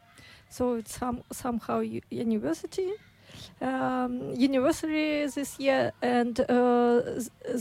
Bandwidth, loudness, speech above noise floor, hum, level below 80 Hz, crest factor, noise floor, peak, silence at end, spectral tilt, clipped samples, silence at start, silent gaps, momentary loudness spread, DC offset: 16 kHz; -28 LUFS; 26 dB; none; -58 dBFS; 16 dB; -54 dBFS; -14 dBFS; 0 s; -5 dB/octave; under 0.1%; 0.2 s; none; 10 LU; under 0.1%